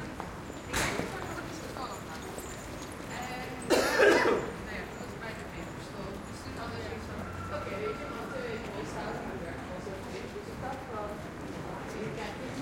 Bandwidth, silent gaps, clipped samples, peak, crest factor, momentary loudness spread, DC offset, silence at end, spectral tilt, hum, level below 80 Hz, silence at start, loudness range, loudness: 16.5 kHz; none; under 0.1%; -12 dBFS; 24 dB; 13 LU; under 0.1%; 0 s; -4.5 dB/octave; none; -52 dBFS; 0 s; 9 LU; -34 LUFS